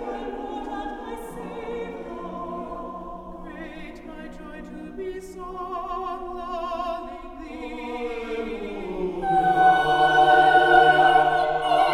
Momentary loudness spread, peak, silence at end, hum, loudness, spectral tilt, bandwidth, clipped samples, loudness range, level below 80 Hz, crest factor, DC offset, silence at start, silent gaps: 22 LU; -2 dBFS; 0 s; none; -22 LUFS; -5 dB/octave; 12 kHz; under 0.1%; 18 LU; -46 dBFS; 20 dB; under 0.1%; 0 s; none